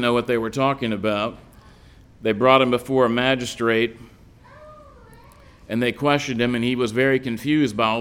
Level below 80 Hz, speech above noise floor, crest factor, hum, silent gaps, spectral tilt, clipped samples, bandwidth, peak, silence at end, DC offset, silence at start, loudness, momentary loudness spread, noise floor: -52 dBFS; 28 dB; 20 dB; none; none; -5.5 dB/octave; under 0.1%; 16.5 kHz; -2 dBFS; 0 s; under 0.1%; 0 s; -21 LUFS; 8 LU; -48 dBFS